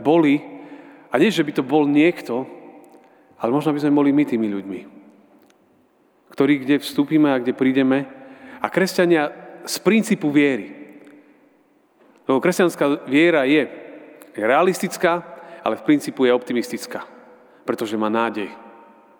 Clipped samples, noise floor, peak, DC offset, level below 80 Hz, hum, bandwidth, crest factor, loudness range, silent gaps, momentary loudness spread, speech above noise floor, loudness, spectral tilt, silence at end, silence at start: under 0.1%; -59 dBFS; 0 dBFS; under 0.1%; -74 dBFS; none; over 20 kHz; 20 dB; 3 LU; none; 17 LU; 40 dB; -19 LUFS; -5.5 dB/octave; 0.5 s; 0 s